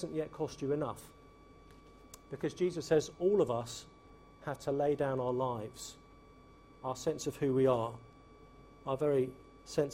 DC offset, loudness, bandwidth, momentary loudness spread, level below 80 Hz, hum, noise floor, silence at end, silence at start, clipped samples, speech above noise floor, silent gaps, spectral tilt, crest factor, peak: under 0.1%; -35 LUFS; 16 kHz; 18 LU; -64 dBFS; none; -58 dBFS; 0 s; 0 s; under 0.1%; 24 dB; none; -6 dB/octave; 18 dB; -18 dBFS